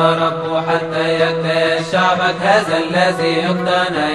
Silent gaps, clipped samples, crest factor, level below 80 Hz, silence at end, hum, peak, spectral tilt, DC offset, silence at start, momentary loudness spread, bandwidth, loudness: none; under 0.1%; 14 dB; -56 dBFS; 0 s; none; 0 dBFS; -5 dB/octave; 0.2%; 0 s; 4 LU; 12 kHz; -15 LUFS